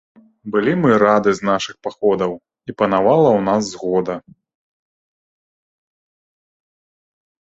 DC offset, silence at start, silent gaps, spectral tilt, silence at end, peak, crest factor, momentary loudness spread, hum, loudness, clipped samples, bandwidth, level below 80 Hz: under 0.1%; 0.45 s; none; -6 dB/octave; 3.3 s; 0 dBFS; 18 dB; 14 LU; none; -17 LUFS; under 0.1%; 8 kHz; -58 dBFS